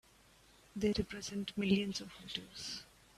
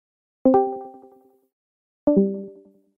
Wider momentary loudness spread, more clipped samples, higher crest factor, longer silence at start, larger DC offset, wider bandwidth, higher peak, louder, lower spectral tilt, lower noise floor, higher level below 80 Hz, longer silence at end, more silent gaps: second, 11 LU vs 20 LU; neither; about the same, 20 dB vs 18 dB; first, 0.75 s vs 0.45 s; neither; first, 13.5 kHz vs 2.5 kHz; second, -20 dBFS vs -6 dBFS; second, -38 LUFS vs -21 LUFS; second, -5 dB/octave vs -12.5 dB/octave; first, -65 dBFS vs -53 dBFS; about the same, -60 dBFS vs -58 dBFS; second, 0.3 s vs 0.45 s; second, none vs 1.53-2.07 s